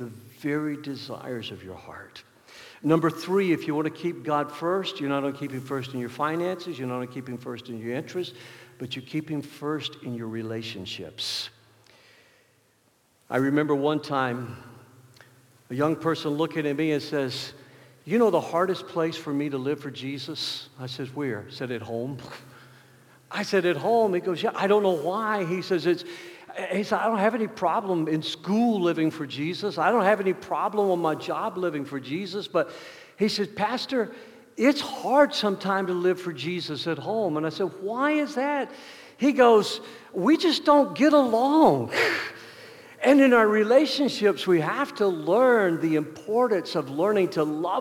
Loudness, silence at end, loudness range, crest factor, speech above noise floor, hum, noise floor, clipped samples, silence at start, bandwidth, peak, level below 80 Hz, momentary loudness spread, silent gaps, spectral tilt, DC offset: -25 LUFS; 0 s; 12 LU; 20 dB; 40 dB; none; -65 dBFS; under 0.1%; 0 s; 17.5 kHz; -6 dBFS; -74 dBFS; 16 LU; none; -5.5 dB/octave; under 0.1%